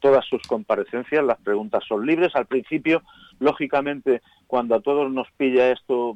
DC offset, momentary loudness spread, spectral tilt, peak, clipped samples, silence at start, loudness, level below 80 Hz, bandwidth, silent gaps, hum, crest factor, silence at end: under 0.1%; 6 LU; -6.5 dB/octave; -8 dBFS; under 0.1%; 0 s; -22 LUFS; -62 dBFS; 8.2 kHz; none; none; 14 dB; 0 s